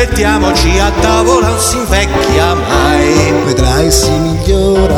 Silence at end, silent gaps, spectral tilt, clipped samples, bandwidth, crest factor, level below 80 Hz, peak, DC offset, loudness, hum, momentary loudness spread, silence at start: 0 s; none; -4.5 dB/octave; 0.2%; 17 kHz; 10 dB; -16 dBFS; 0 dBFS; under 0.1%; -10 LUFS; none; 3 LU; 0 s